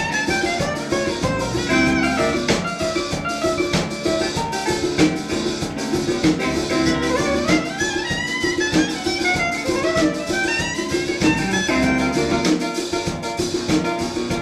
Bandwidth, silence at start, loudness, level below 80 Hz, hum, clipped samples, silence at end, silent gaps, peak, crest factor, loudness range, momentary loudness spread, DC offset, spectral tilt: 15 kHz; 0 s; -20 LUFS; -40 dBFS; none; under 0.1%; 0 s; none; -4 dBFS; 16 dB; 1 LU; 5 LU; under 0.1%; -4 dB/octave